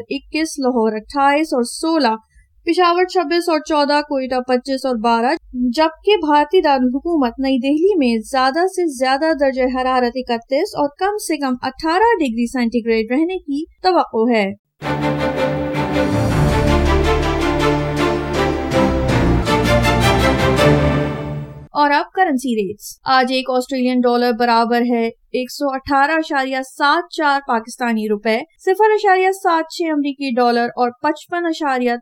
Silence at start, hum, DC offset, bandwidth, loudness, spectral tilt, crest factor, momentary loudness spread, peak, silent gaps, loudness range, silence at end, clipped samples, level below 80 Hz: 0 s; none; under 0.1%; 17 kHz; -17 LUFS; -5.5 dB/octave; 14 dB; 7 LU; -2 dBFS; 14.59-14.64 s; 2 LU; 0 s; under 0.1%; -32 dBFS